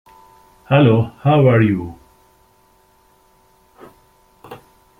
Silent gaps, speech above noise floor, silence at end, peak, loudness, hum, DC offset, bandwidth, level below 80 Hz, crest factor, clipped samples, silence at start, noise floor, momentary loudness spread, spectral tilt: none; 41 dB; 0.45 s; -2 dBFS; -15 LUFS; none; under 0.1%; 4.2 kHz; -52 dBFS; 18 dB; under 0.1%; 0.7 s; -55 dBFS; 9 LU; -9.5 dB/octave